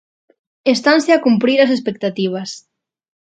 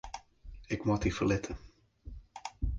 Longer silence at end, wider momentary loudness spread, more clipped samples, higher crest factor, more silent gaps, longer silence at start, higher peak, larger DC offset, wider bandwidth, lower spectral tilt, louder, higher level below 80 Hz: first, 0.7 s vs 0 s; second, 12 LU vs 24 LU; neither; about the same, 16 dB vs 20 dB; neither; first, 0.65 s vs 0.05 s; first, 0 dBFS vs -16 dBFS; neither; about the same, 9.2 kHz vs 9.4 kHz; about the same, -5 dB/octave vs -6 dB/octave; first, -15 LUFS vs -33 LUFS; second, -66 dBFS vs -44 dBFS